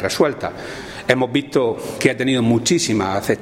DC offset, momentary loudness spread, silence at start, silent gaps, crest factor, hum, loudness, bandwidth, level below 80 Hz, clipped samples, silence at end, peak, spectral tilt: under 0.1%; 11 LU; 0 s; none; 18 dB; none; -19 LUFS; 16.5 kHz; -50 dBFS; under 0.1%; 0 s; 0 dBFS; -4.5 dB/octave